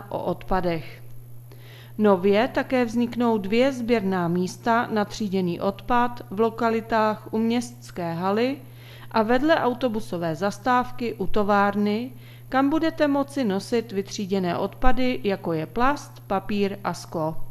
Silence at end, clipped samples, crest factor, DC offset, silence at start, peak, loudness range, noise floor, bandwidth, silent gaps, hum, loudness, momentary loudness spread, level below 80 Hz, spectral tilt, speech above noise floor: 0 s; under 0.1%; 22 dB; under 0.1%; 0 s; -2 dBFS; 3 LU; -43 dBFS; 14 kHz; none; none; -24 LUFS; 9 LU; -44 dBFS; -6 dB/octave; 20 dB